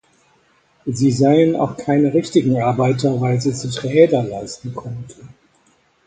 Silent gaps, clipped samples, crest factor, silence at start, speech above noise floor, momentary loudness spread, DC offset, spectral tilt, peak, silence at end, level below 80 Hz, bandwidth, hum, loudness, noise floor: none; under 0.1%; 18 dB; 0.85 s; 41 dB; 16 LU; under 0.1%; -7 dB/octave; 0 dBFS; 0.8 s; -54 dBFS; 9.4 kHz; none; -17 LUFS; -58 dBFS